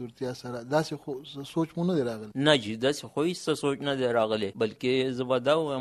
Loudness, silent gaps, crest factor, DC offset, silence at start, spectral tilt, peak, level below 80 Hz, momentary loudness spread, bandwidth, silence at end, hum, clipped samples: -28 LUFS; none; 20 dB; under 0.1%; 0 s; -5.5 dB/octave; -8 dBFS; -66 dBFS; 11 LU; 14 kHz; 0 s; none; under 0.1%